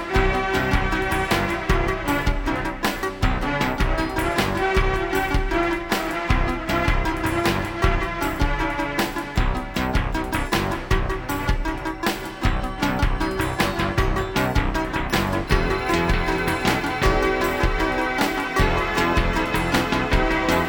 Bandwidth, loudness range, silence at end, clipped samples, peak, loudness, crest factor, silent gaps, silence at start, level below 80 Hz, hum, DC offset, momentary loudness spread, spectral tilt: over 20 kHz; 3 LU; 0 s; under 0.1%; -4 dBFS; -23 LUFS; 18 dB; none; 0 s; -28 dBFS; none; under 0.1%; 4 LU; -5 dB/octave